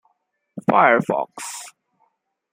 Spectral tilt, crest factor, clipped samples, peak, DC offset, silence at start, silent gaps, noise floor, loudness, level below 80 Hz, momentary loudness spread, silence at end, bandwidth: -5 dB/octave; 22 dB; under 0.1%; 0 dBFS; under 0.1%; 0.55 s; none; -71 dBFS; -19 LUFS; -68 dBFS; 23 LU; 0.85 s; 16 kHz